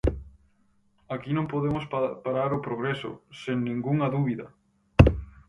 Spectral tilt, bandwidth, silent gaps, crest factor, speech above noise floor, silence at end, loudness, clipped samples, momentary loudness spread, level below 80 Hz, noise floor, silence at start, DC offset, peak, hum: -8.5 dB/octave; 11 kHz; none; 26 dB; 37 dB; 0.2 s; -27 LUFS; under 0.1%; 17 LU; -36 dBFS; -65 dBFS; 0.05 s; under 0.1%; 0 dBFS; none